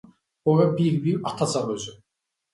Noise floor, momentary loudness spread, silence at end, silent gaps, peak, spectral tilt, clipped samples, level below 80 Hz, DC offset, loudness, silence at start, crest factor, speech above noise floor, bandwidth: -82 dBFS; 11 LU; 0.6 s; none; -6 dBFS; -6.5 dB/octave; under 0.1%; -64 dBFS; under 0.1%; -24 LUFS; 0.45 s; 18 dB; 60 dB; 11.5 kHz